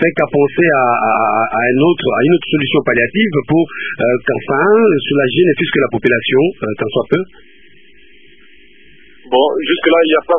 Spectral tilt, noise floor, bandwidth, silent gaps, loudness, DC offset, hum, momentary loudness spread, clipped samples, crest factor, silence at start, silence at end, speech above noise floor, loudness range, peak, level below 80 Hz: -9 dB/octave; -46 dBFS; 3.7 kHz; none; -13 LUFS; 1%; none; 6 LU; under 0.1%; 14 dB; 0 s; 0 s; 34 dB; 6 LU; 0 dBFS; -52 dBFS